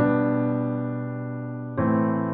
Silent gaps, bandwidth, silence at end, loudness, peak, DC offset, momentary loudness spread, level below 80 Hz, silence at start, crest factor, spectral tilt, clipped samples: none; 3.9 kHz; 0 s; -26 LUFS; -10 dBFS; under 0.1%; 9 LU; -58 dBFS; 0 s; 14 dB; -9.5 dB/octave; under 0.1%